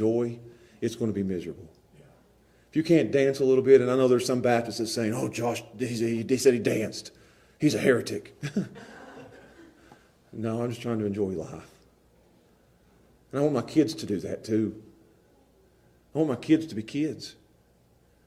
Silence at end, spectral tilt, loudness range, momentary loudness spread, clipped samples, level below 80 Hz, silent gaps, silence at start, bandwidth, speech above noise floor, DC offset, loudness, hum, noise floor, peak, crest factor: 0.95 s; -6 dB/octave; 11 LU; 19 LU; under 0.1%; -64 dBFS; none; 0 s; 14.5 kHz; 36 dB; under 0.1%; -26 LUFS; none; -62 dBFS; -6 dBFS; 22 dB